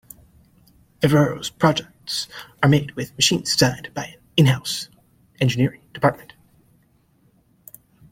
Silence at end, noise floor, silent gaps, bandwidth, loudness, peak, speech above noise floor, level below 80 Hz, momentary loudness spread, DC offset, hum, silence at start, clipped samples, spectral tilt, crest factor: 1.95 s; -60 dBFS; none; 16.5 kHz; -21 LUFS; -2 dBFS; 40 dB; -54 dBFS; 13 LU; under 0.1%; none; 1 s; under 0.1%; -4.5 dB/octave; 20 dB